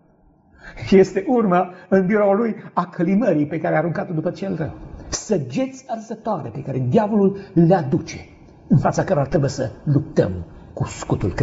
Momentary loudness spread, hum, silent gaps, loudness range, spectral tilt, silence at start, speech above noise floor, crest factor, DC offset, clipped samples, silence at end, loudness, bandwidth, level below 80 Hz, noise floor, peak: 12 LU; none; none; 5 LU; -7.5 dB/octave; 0.65 s; 36 dB; 18 dB; under 0.1%; under 0.1%; 0 s; -20 LUFS; 8 kHz; -44 dBFS; -55 dBFS; -2 dBFS